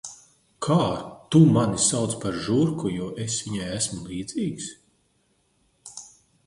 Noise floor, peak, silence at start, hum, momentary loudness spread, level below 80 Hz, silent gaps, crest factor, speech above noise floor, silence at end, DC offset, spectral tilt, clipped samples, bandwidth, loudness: -67 dBFS; -4 dBFS; 0.05 s; none; 20 LU; -54 dBFS; none; 20 dB; 44 dB; 0.4 s; under 0.1%; -5 dB/octave; under 0.1%; 11.5 kHz; -24 LUFS